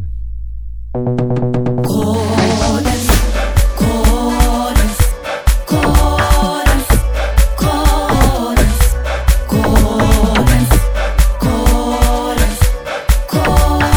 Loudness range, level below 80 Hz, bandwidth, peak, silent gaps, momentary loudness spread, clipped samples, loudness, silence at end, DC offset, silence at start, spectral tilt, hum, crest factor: 1 LU; -14 dBFS; over 20 kHz; 0 dBFS; none; 4 LU; under 0.1%; -14 LUFS; 0 s; under 0.1%; 0 s; -5.5 dB/octave; none; 12 dB